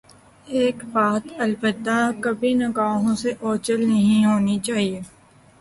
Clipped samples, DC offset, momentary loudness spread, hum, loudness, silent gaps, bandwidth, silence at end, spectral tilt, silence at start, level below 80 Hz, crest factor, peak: under 0.1%; under 0.1%; 7 LU; none; -21 LUFS; none; 11.5 kHz; 0.55 s; -5.5 dB/octave; 0.45 s; -58 dBFS; 14 dB; -8 dBFS